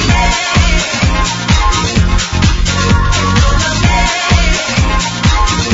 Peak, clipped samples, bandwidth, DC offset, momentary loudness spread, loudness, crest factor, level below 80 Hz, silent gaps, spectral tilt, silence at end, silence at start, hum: 0 dBFS; under 0.1%; 8 kHz; under 0.1%; 2 LU; -12 LUFS; 10 dB; -14 dBFS; none; -4 dB/octave; 0 s; 0 s; none